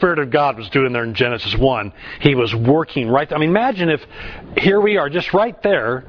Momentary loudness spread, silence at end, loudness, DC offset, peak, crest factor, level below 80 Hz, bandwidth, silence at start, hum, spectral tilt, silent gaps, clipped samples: 5 LU; 0.05 s; -17 LUFS; under 0.1%; 0 dBFS; 16 dB; -36 dBFS; 5.4 kHz; 0 s; none; -8 dB/octave; none; under 0.1%